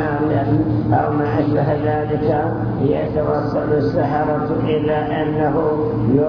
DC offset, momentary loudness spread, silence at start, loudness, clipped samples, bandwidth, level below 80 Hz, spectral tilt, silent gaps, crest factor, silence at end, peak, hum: under 0.1%; 2 LU; 0 s; -18 LUFS; under 0.1%; 5.4 kHz; -38 dBFS; -10.5 dB/octave; none; 14 dB; 0 s; -2 dBFS; none